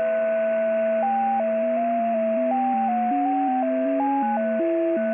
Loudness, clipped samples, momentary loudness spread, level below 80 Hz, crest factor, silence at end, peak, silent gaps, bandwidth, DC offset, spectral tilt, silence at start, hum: -23 LUFS; under 0.1%; 1 LU; -74 dBFS; 8 dB; 0 s; -14 dBFS; none; 3.6 kHz; under 0.1%; -10 dB/octave; 0 s; none